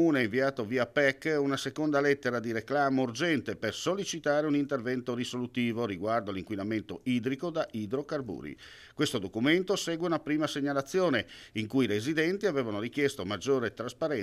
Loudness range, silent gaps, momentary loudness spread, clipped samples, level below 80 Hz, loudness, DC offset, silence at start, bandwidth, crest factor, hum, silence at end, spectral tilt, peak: 4 LU; none; 7 LU; under 0.1%; -66 dBFS; -30 LUFS; under 0.1%; 0 s; 15 kHz; 18 dB; none; 0 s; -5 dB/octave; -12 dBFS